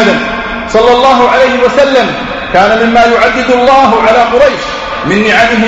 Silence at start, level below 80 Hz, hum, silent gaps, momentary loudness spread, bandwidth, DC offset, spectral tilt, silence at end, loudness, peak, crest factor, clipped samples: 0 s; -32 dBFS; none; none; 9 LU; 8.4 kHz; under 0.1%; -4.5 dB/octave; 0 s; -7 LUFS; 0 dBFS; 8 dB; 1%